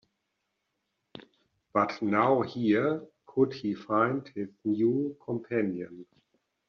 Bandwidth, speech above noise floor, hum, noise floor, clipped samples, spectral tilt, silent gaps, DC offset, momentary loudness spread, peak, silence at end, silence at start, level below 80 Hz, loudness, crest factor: 6.6 kHz; 53 dB; none; -81 dBFS; under 0.1%; -6 dB/octave; none; under 0.1%; 10 LU; -12 dBFS; 0.65 s; 1.15 s; -72 dBFS; -29 LUFS; 18 dB